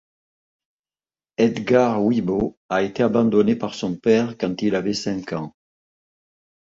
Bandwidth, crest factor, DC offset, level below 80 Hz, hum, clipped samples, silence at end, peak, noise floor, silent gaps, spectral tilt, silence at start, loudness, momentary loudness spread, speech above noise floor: 7.8 kHz; 18 dB; under 0.1%; -56 dBFS; none; under 0.1%; 1.3 s; -4 dBFS; under -90 dBFS; 2.57-2.69 s; -6.5 dB/octave; 1.4 s; -21 LUFS; 10 LU; over 70 dB